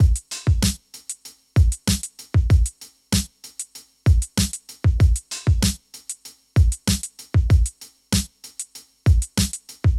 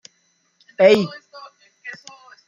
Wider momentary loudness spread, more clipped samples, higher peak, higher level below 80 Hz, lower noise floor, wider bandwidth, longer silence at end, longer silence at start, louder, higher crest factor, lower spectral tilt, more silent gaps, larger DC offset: second, 15 LU vs 25 LU; neither; second, -6 dBFS vs -2 dBFS; first, -24 dBFS vs -70 dBFS; second, -38 dBFS vs -65 dBFS; first, 15 kHz vs 7.6 kHz; second, 0 s vs 0.55 s; second, 0 s vs 0.8 s; second, -22 LUFS vs -16 LUFS; second, 14 dB vs 20 dB; about the same, -4.5 dB/octave vs -5.5 dB/octave; neither; neither